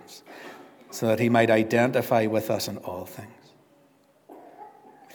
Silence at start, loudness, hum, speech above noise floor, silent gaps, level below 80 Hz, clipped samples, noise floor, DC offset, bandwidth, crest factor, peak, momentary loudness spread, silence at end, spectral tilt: 0.1 s; -24 LUFS; none; 37 dB; none; -74 dBFS; under 0.1%; -61 dBFS; under 0.1%; over 20 kHz; 20 dB; -6 dBFS; 23 LU; 0.45 s; -5.5 dB/octave